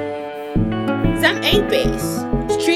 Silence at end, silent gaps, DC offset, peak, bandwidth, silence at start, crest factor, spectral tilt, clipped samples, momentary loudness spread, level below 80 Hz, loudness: 0 s; none; 0.3%; 0 dBFS; 16 kHz; 0 s; 18 dB; -5 dB/octave; under 0.1%; 8 LU; -30 dBFS; -19 LUFS